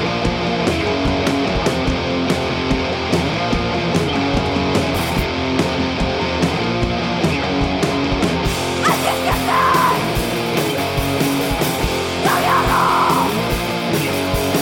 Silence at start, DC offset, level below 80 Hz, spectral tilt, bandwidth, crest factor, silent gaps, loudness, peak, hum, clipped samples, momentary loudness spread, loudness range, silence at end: 0 s; under 0.1%; -30 dBFS; -5 dB/octave; 17 kHz; 16 dB; none; -18 LUFS; -2 dBFS; none; under 0.1%; 4 LU; 2 LU; 0 s